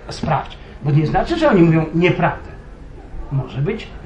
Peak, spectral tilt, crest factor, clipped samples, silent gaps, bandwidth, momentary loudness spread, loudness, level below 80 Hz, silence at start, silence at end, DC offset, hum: -2 dBFS; -8 dB/octave; 16 dB; under 0.1%; none; 9 kHz; 20 LU; -17 LUFS; -34 dBFS; 0 s; 0 s; under 0.1%; none